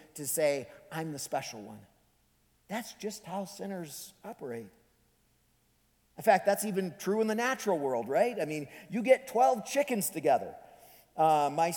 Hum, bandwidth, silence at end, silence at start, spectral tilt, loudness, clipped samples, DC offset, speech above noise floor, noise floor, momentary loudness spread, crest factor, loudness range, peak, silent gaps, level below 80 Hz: none; 19.5 kHz; 0 s; 0.15 s; -4 dB/octave; -31 LUFS; under 0.1%; under 0.1%; 40 dB; -70 dBFS; 16 LU; 22 dB; 12 LU; -10 dBFS; none; -76 dBFS